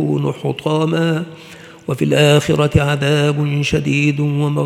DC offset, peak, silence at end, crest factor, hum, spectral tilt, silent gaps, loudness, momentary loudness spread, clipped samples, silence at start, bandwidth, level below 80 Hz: under 0.1%; 0 dBFS; 0 s; 16 dB; none; -6 dB/octave; none; -16 LUFS; 10 LU; under 0.1%; 0 s; 13.5 kHz; -42 dBFS